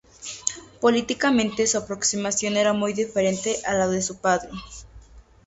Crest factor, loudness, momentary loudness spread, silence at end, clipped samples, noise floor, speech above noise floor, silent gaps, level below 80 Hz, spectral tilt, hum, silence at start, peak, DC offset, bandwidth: 22 dB; -23 LUFS; 10 LU; 0.25 s; under 0.1%; -48 dBFS; 25 dB; none; -52 dBFS; -3 dB/octave; none; 0.2 s; -2 dBFS; under 0.1%; 8.2 kHz